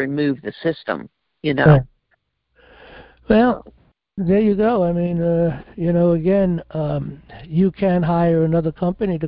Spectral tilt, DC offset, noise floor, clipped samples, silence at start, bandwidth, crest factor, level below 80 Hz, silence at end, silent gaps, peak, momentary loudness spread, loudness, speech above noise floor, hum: -13 dB/octave; under 0.1%; -67 dBFS; under 0.1%; 0 s; 5.2 kHz; 18 dB; -42 dBFS; 0 s; none; 0 dBFS; 11 LU; -19 LUFS; 50 dB; none